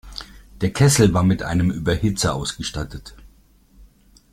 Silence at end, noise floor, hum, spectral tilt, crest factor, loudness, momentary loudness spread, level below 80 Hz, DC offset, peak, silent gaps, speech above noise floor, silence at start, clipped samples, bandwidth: 0.45 s; -53 dBFS; none; -5 dB/octave; 20 dB; -20 LUFS; 19 LU; -38 dBFS; under 0.1%; -2 dBFS; none; 34 dB; 0.05 s; under 0.1%; 15.5 kHz